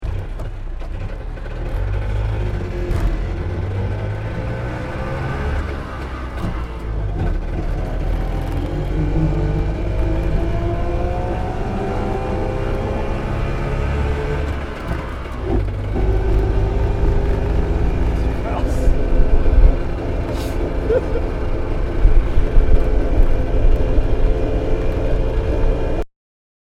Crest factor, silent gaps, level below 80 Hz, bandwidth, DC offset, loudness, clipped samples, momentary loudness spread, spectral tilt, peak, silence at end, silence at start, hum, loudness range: 18 dB; none; -18 dBFS; 7.6 kHz; under 0.1%; -22 LUFS; under 0.1%; 7 LU; -8 dB/octave; 0 dBFS; 0.7 s; 0 s; none; 5 LU